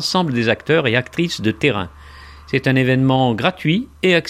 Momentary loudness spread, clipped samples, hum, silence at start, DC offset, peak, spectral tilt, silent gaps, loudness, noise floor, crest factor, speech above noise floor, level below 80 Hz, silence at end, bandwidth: 6 LU; under 0.1%; none; 0 s; under 0.1%; 0 dBFS; -6 dB/octave; none; -17 LUFS; -39 dBFS; 18 dB; 22 dB; -46 dBFS; 0 s; 14.5 kHz